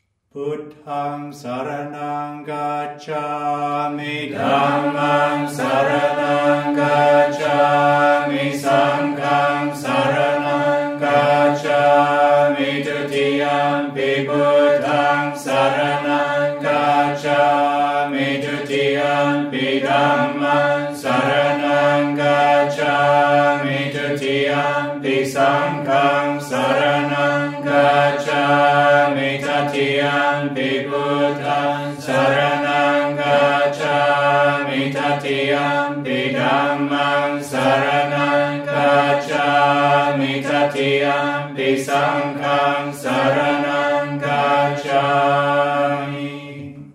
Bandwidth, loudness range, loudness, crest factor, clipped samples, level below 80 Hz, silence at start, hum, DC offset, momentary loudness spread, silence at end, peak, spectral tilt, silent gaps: 14 kHz; 3 LU; -17 LUFS; 14 dB; under 0.1%; -64 dBFS; 0.35 s; none; under 0.1%; 7 LU; 0.05 s; -2 dBFS; -5.5 dB/octave; none